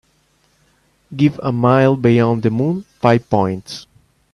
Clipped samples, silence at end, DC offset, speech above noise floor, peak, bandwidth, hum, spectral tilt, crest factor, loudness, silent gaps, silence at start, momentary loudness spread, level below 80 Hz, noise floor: under 0.1%; 0.5 s; under 0.1%; 44 dB; 0 dBFS; 11.5 kHz; none; -8 dB/octave; 16 dB; -16 LUFS; none; 1.1 s; 15 LU; -52 dBFS; -59 dBFS